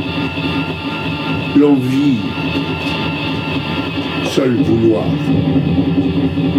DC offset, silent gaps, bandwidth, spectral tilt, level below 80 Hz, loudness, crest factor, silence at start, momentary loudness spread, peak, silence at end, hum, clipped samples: under 0.1%; none; 12.5 kHz; -7 dB/octave; -40 dBFS; -16 LUFS; 14 dB; 0 s; 6 LU; 0 dBFS; 0 s; none; under 0.1%